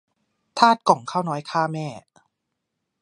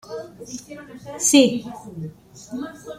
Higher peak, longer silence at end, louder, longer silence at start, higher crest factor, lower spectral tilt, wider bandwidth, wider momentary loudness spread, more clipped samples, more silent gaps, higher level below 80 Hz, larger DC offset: about the same, 0 dBFS vs -2 dBFS; first, 1.05 s vs 0 s; second, -21 LUFS vs -18 LUFS; first, 0.55 s vs 0.1 s; about the same, 24 dB vs 22 dB; first, -5 dB/octave vs -3 dB/octave; second, 11 kHz vs 16 kHz; second, 15 LU vs 22 LU; neither; neither; second, -74 dBFS vs -60 dBFS; neither